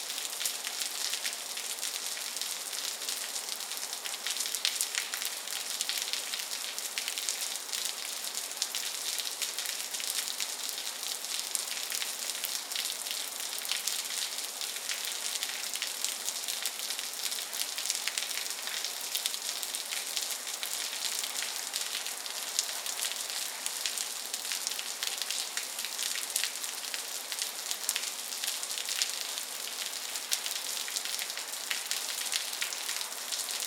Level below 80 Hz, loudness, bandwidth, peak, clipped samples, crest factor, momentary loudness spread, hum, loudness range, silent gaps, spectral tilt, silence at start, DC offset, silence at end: under -90 dBFS; -32 LUFS; 19 kHz; -4 dBFS; under 0.1%; 32 dB; 3 LU; none; 1 LU; none; 3.5 dB/octave; 0 s; under 0.1%; 0 s